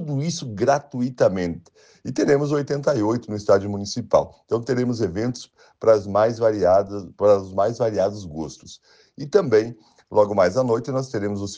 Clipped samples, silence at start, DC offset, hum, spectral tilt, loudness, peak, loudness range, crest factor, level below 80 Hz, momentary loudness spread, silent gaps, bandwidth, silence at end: under 0.1%; 0 s; under 0.1%; none; -6.5 dB/octave; -21 LUFS; -4 dBFS; 2 LU; 18 dB; -56 dBFS; 12 LU; none; 9.4 kHz; 0 s